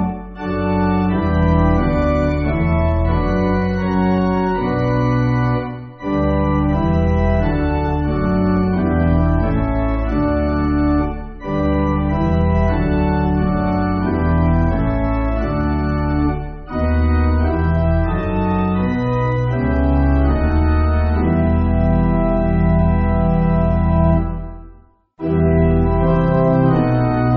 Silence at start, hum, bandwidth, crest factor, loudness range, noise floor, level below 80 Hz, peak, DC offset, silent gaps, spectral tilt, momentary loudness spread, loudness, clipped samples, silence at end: 0 s; none; 4.8 kHz; 14 dB; 2 LU; -46 dBFS; -22 dBFS; -2 dBFS; under 0.1%; none; -8.5 dB/octave; 4 LU; -17 LUFS; under 0.1%; 0 s